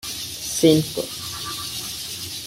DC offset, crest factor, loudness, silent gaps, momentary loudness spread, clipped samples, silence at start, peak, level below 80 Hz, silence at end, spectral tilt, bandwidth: under 0.1%; 22 dB; -23 LUFS; none; 12 LU; under 0.1%; 0.05 s; -2 dBFS; -52 dBFS; 0 s; -4 dB/octave; 16.5 kHz